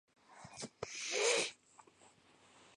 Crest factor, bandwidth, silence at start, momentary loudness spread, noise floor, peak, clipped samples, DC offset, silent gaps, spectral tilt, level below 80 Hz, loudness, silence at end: 20 dB; 11.5 kHz; 0.3 s; 21 LU; -66 dBFS; -22 dBFS; under 0.1%; under 0.1%; none; -0.5 dB/octave; -78 dBFS; -37 LUFS; 1.25 s